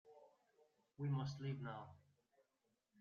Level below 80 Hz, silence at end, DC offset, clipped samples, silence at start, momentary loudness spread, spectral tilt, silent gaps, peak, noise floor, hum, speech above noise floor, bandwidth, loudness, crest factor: -82 dBFS; 1 s; under 0.1%; under 0.1%; 0.05 s; 11 LU; -7 dB/octave; none; -32 dBFS; -87 dBFS; none; 41 dB; 6.8 kHz; -47 LUFS; 18 dB